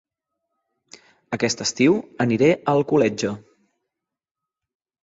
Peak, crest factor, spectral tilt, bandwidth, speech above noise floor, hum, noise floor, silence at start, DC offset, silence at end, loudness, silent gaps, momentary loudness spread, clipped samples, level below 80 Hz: -4 dBFS; 18 dB; -5 dB/octave; 8 kHz; 67 dB; none; -87 dBFS; 1.3 s; under 0.1%; 1.65 s; -20 LUFS; none; 10 LU; under 0.1%; -60 dBFS